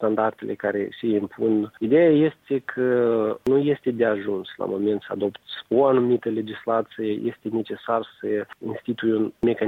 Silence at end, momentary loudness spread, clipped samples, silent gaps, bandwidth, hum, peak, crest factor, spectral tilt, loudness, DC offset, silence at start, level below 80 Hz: 0 s; 10 LU; under 0.1%; none; 4.5 kHz; none; -8 dBFS; 16 dB; -8.5 dB/octave; -23 LUFS; under 0.1%; 0 s; -62 dBFS